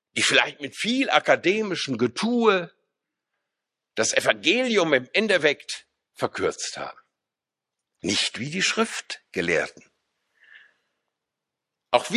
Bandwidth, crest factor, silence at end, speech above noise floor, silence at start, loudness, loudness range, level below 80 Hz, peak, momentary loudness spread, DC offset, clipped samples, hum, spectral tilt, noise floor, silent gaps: 13.5 kHz; 24 dB; 0 s; 64 dB; 0.15 s; -23 LUFS; 5 LU; -64 dBFS; -2 dBFS; 13 LU; under 0.1%; under 0.1%; none; -2.5 dB/octave; -88 dBFS; none